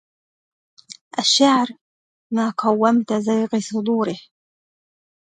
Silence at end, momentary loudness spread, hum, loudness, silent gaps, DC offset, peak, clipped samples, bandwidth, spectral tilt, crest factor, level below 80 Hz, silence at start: 1 s; 12 LU; none; -19 LUFS; 1.01-1.11 s, 1.81-2.30 s; under 0.1%; -2 dBFS; under 0.1%; 9.6 kHz; -3.5 dB/octave; 18 dB; -72 dBFS; 0.9 s